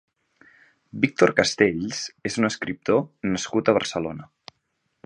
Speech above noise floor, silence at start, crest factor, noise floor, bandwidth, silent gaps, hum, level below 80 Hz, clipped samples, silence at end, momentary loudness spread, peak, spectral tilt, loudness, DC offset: 51 dB; 0.95 s; 24 dB; -74 dBFS; 11 kHz; none; none; -58 dBFS; under 0.1%; 0.8 s; 11 LU; -2 dBFS; -4.5 dB/octave; -23 LUFS; under 0.1%